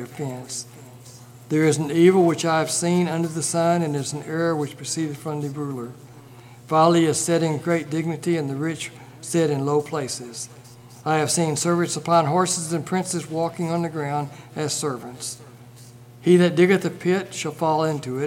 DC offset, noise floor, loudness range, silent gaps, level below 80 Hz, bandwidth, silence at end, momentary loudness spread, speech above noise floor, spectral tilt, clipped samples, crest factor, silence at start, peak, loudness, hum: under 0.1%; -45 dBFS; 5 LU; none; -68 dBFS; 16.5 kHz; 0 s; 15 LU; 23 dB; -5 dB/octave; under 0.1%; 20 dB; 0 s; -4 dBFS; -22 LUFS; none